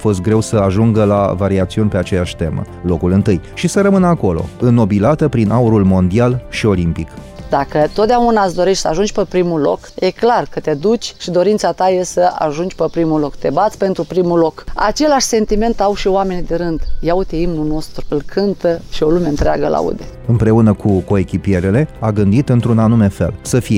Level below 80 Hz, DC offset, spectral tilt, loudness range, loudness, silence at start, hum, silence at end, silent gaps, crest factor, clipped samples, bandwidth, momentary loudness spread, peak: -30 dBFS; under 0.1%; -6.5 dB/octave; 4 LU; -15 LUFS; 0 s; none; 0 s; none; 12 dB; under 0.1%; 15.5 kHz; 7 LU; 0 dBFS